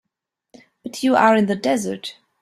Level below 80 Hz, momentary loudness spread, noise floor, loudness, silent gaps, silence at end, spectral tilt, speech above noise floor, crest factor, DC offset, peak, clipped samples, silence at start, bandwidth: -64 dBFS; 19 LU; -81 dBFS; -18 LUFS; none; 0.3 s; -5 dB/octave; 63 dB; 20 dB; under 0.1%; -2 dBFS; under 0.1%; 0.85 s; 14.5 kHz